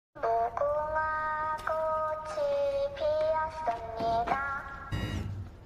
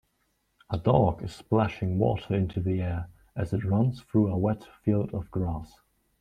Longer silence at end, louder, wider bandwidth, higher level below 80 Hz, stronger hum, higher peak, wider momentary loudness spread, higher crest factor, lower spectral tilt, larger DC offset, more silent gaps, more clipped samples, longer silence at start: second, 0 s vs 0.55 s; second, -31 LUFS vs -28 LUFS; first, 13.5 kHz vs 9.4 kHz; about the same, -50 dBFS vs -50 dBFS; neither; second, -14 dBFS vs -6 dBFS; second, 6 LU vs 11 LU; second, 16 dB vs 22 dB; second, -6 dB/octave vs -9 dB/octave; neither; neither; neither; second, 0.15 s vs 0.7 s